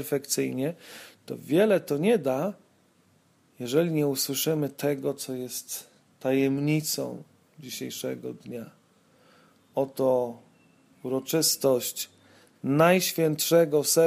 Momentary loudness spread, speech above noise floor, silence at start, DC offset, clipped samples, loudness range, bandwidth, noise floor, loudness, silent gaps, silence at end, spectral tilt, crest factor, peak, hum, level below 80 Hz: 17 LU; 38 dB; 0 s; under 0.1%; under 0.1%; 7 LU; 15.5 kHz; -64 dBFS; -26 LUFS; none; 0 s; -4.5 dB/octave; 20 dB; -8 dBFS; none; -74 dBFS